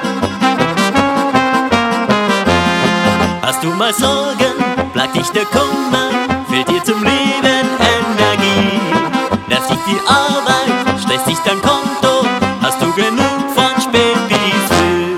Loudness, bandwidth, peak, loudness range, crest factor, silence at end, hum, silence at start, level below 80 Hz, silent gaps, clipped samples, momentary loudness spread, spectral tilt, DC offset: -13 LUFS; 17 kHz; 0 dBFS; 1 LU; 14 dB; 0 s; none; 0 s; -42 dBFS; none; under 0.1%; 3 LU; -4 dB/octave; under 0.1%